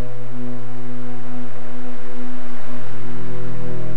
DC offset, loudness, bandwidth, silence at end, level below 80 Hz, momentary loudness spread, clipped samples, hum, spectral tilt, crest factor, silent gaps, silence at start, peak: 40%; -34 LUFS; 11 kHz; 0 s; -58 dBFS; 4 LU; under 0.1%; none; -8 dB/octave; 8 dB; none; 0 s; -6 dBFS